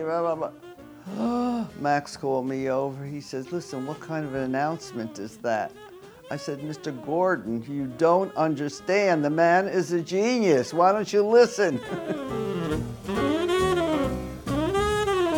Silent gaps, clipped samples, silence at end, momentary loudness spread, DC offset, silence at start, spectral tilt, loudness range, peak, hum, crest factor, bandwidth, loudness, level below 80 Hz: none; under 0.1%; 0 s; 13 LU; under 0.1%; 0 s; -5.5 dB/octave; 9 LU; -8 dBFS; none; 18 dB; over 20 kHz; -25 LUFS; -48 dBFS